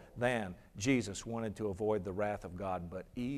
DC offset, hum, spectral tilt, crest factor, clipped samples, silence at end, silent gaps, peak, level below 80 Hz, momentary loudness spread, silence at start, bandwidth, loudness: under 0.1%; none; -5.5 dB/octave; 20 dB; under 0.1%; 0 s; none; -18 dBFS; -60 dBFS; 8 LU; 0 s; 14 kHz; -37 LUFS